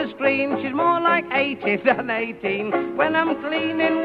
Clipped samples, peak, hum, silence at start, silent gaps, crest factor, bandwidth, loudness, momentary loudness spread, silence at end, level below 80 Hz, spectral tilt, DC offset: under 0.1%; -4 dBFS; none; 0 s; none; 18 dB; 5.4 kHz; -21 LUFS; 5 LU; 0 s; -62 dBFS; -7 dB/octave; under 0.1%